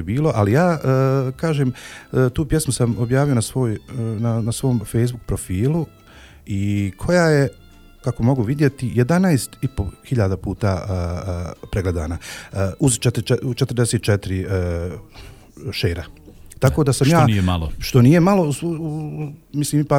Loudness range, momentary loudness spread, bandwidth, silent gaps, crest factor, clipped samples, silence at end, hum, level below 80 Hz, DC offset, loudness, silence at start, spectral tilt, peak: 5 LU; 12 LU; 16 kHz; none; 18 dB; under 0.1%; 0 s; none; -38 dBFS; under 0.1%; -20 LUFS; 0 s; -6.5 dB/octave; -2 dBFS